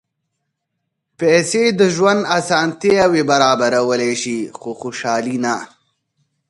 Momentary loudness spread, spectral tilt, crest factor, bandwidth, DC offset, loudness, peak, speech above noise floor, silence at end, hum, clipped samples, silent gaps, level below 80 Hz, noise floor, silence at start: 11 LU; -4 dB/octave; 18 dB; 11.5 kHz; under 0.1%; -16 LUFS; 0 dBFS; 59 dB; 0.85 s; none; under 0.1%; none; -58 dBFS; -75 dBFS; 1.2 s